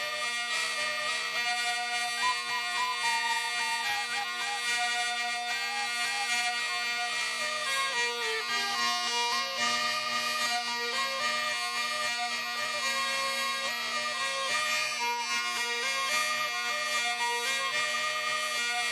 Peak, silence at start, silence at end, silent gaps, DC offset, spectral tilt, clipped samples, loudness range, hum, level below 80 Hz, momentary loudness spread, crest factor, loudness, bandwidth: -16 dBFS; 0 s; 0 s; none; under 0.1%; 1.5 dB/octave; under 0.1%; 1 LU; none; -74 dBFS; 3 LU; 14 dB; -29 LUFS; 14 kHz